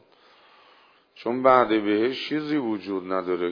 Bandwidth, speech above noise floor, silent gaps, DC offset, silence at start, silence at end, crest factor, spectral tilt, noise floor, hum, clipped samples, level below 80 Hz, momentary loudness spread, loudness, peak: 5.4 kHz; 34 dB; none; under 0.1%; 1.2 s; 0 s; 22 dB; -7 dB/octave; -57 dBFS; none; under 0.1%; -68 dBFS; 11 LU; -24 LUFS; -4 dBFS